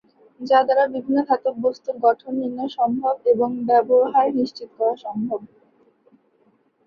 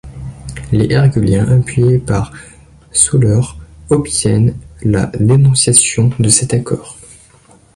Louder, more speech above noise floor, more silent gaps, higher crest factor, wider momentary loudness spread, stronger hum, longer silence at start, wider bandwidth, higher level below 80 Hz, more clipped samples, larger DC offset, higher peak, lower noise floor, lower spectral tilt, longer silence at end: second, -21 LUFS vs -12 LUFS; first, 42 dB vs 34 dB; neither; about the same, 18 dB vs 14 dB; second, 10 LU vs 14 LU; neither; first, 0.4 s vs 0.05 s; second, 6.8 kHz vs 11.5 kHz; second, -68 dBFS vs -34 dBFS; neither; neither; second, -4 dBFS vs 0 dBFS; first, -62 dBFS vs -45 dBFS; first, -7 dB/octave vs -5 dB/octave; first, 1.4 s vs 0.85 s